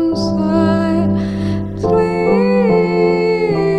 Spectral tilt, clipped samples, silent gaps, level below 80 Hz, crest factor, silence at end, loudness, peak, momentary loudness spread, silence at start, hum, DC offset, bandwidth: -8 dB/octave; under 0.1%; none; -38 dBFS; 12 dB; 0 s; -15 LUFS; -2 dBFS; 6 LU; 0 s; none; under 0.1%; 9.2 kHz